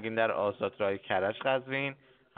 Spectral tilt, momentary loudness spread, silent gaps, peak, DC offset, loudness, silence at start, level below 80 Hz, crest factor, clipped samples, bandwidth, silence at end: -3 dB/octave; 4 LU; none; -12 dBFS; under 0.1%; -31 LUFS; 0 s; -74 dBFS; 20 dB; under 0.1%; 4.5 kHz; 0.45 s